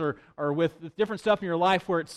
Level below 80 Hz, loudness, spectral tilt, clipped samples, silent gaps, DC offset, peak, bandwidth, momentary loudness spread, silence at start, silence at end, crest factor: -64 dBFS; -27 LUFS; -6 dB/octave; under 0.1%; none; under 0.1%; -10 dBFS; 12.5 kHz; 7 LU; 0 s; 0 s; 16 dB